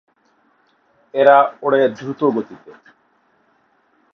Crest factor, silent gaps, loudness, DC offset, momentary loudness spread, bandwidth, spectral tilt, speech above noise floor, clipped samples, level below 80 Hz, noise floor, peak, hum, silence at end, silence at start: 20 dB; none; -16 LUFS; under 0.1%; 14 LU; 6.4 kHz; -7 dB/octave; 44 dB; under 0.1%; -72 dBFS; -60 dBFS; 0 dBFS; none; 1.6 s; 1.15 s